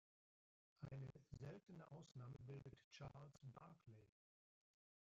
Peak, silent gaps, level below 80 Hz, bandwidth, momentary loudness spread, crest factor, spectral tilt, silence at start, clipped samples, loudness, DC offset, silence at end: -44 dBFS; 2.84-2.91 s; -80 dBFS; 7.4 kHz; 7 LU; 16 dB; -7 dB/octave; 0.8 s; under 0.1%; -60 LUFS; under 0.1%; 1 s